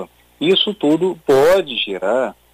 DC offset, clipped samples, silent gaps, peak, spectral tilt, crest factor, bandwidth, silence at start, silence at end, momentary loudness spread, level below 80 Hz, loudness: under 0.1%; under 0.1%; none; -4 dBFS; -5 dB/octave; 14 dB; 15.5 kHz; 0 s; 0.2 s; 8 LU; -50 dBFS; -16 LUFS